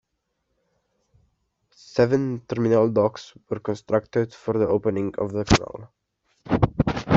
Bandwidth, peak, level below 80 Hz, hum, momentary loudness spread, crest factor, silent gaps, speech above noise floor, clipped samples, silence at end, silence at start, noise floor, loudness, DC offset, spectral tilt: 8 kHz; -2 dBFS; -44 dBFS; none; 10 LU; 22 dB; none; 53 dB; under 0.1%; 0 s; 1.95 s; -76 dBFS; -23 LUFS; under 0.1%; -6.5 dB/octave